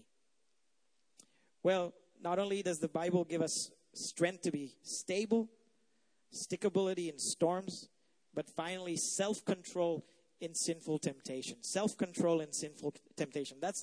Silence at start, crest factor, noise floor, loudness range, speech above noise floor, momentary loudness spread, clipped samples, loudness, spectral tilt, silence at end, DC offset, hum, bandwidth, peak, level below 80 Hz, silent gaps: 1.65 s; 20 dB; -82 dBFS; 2 LU; 46 dB; 10 LU; under 0.1%; -37 LUFS; -4 dB/octave; 0 s; under 0.1%; none; 11 kHz; -18 dBFS; -82 dBFS; none